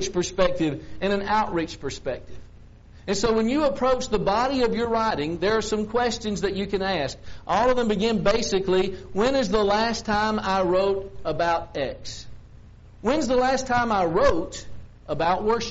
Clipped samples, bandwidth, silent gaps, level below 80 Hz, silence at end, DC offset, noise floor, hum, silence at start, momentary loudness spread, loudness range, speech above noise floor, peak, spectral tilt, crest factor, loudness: under 0.1%; 8 kHz; none; -42 dBFS; 0 s; under 0.1%; -47 dBFS; none; 0 s; 9 LU; 3 LU; 23 dB; -4 dBFS; -3.5 dB/octave; 20 dB; -24 LUFS